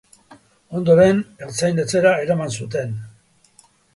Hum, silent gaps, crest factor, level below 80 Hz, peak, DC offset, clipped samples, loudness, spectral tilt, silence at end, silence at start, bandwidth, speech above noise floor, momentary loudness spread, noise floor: none; none; 18 dB; -54 dBFS; -2 dBFS; under 0.1%; under 0.1%; -19 LUFS; -5.5 dB/octave; 0.85 s; 0.3 s; 11.5 kHz; 37 dB; 15 LU; -55 dBFS